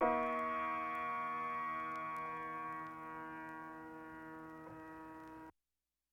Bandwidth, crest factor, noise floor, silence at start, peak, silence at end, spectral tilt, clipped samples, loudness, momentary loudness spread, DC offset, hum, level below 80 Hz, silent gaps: 17 kHz; 20 dB; under -90 dBFS; 0 s; -22 dBFS; 0.6 s; -6 dB/octave; under 0.1%; -43 LUFS; 14 LU; under 0.1%; none; -76 dBFS; none